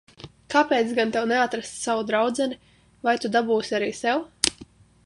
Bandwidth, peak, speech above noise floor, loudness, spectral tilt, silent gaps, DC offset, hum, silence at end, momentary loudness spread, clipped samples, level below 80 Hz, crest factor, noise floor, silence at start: 11.5 kHz; 0 dBFS; 26 dB; -24 LUFS; -3 dB/octave; none; under 0.1%; none; 0.4 s; 6 LU; under 0.1%; -60 dBFS; 24 dB; -49 dBFS; 0.25 s